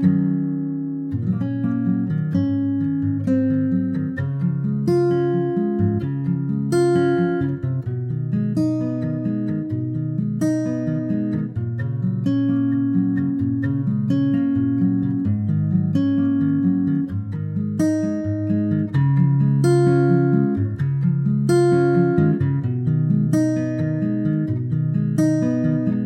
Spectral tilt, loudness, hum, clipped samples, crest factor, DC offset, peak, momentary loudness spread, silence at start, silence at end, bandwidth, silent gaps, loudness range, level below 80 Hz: -9 dB/octave; -21 LUFS; none; under 0.1%; 16 dB; under 0.1%; -4 dBFS; 7 LU; 0 s; 0 s; 11.5 kHz; none; 4 LU; -54 dBFS